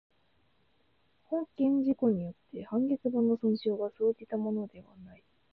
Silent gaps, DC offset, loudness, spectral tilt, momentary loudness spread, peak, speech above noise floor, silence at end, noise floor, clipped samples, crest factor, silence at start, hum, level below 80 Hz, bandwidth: none; under 0.1%; -31 LUFS; -11 dB/octave; 9 LU; -16 dBFS; 42 dB; 0.4 s; -72 dBFS; under 0.1%; 16 dB; 1.3 s; none; -70 dBFS; 5 kHz